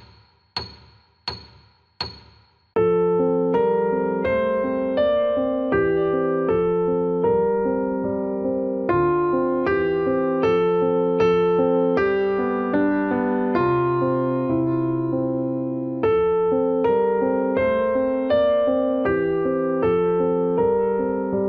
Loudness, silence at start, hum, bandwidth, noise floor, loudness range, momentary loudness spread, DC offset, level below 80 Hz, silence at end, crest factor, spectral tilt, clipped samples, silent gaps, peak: -21 LUFS; 0 s; none; 6.2 kHz; -55 dBFS; 2 LU; 5 LU; under 0.1%; -50 dBFS; 0 s; 14 dB; -8.5 dB/octave; under 0.1%; none; -8 dBFS